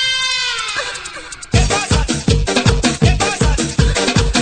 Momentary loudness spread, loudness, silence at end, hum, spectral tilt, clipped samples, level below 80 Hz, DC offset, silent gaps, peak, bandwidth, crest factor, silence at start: 7 LU; -15 LUFS; 0 s; none; -4 dB/octave; under 0.1%; -22 dBFS; under 0.1%; none; 0 dBFS; 9.4 kHz; 16 dB; 0 s